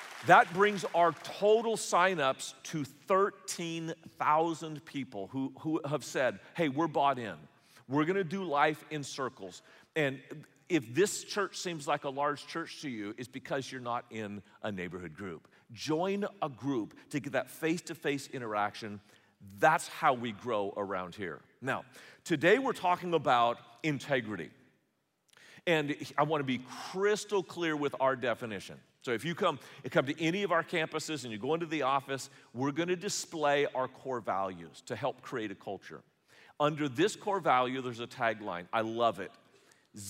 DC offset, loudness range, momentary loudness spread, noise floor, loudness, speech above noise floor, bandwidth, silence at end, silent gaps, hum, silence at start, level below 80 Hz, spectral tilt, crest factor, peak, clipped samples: under 0.1%; 6 LU; 14 LU; -78 dBFS; -32 LUFS; 45 dB; 16 kHz; 0 s; none; none; 0 s; -82 dBFS; -4.5 dB/octave; 24 dB; -8 dBFS; under 0.1%